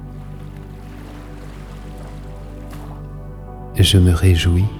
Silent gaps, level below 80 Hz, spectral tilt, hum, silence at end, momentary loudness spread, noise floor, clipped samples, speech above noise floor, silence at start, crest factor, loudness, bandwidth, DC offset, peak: none; -30 dBFS; -5.5 dB/octave; none; 0 s; 22 LU; -33 dBFS; under 0.1%; 20 dB; 0 s; 16 dB; -15 LUFS; 15 kHz; under 0.1%; -2 dBFS